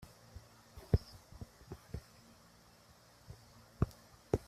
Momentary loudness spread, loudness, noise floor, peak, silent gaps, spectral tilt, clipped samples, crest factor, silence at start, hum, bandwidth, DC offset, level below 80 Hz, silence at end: 25 LU; -41 LUFS; -63 dBFS; -16 dBFS; none; -7.5 dB/octave; under 0.1%; 28 dB; 0 s; none; 15 kHz; under 0.1%; -50 dBFS; 0.1 s